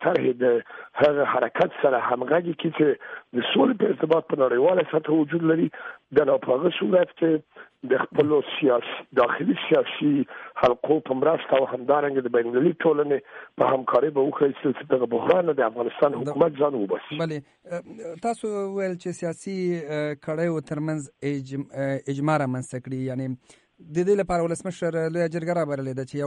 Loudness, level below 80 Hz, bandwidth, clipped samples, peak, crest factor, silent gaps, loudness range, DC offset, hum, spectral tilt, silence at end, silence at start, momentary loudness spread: -24 LUFS; -62 dBFS; 10.5 kHz; under 0.1%; -6 dBFS; 16 dB; none; 6 LU; under 0.1%; none; -6.5 dB/octave; 0 s; 0 s; 9 LU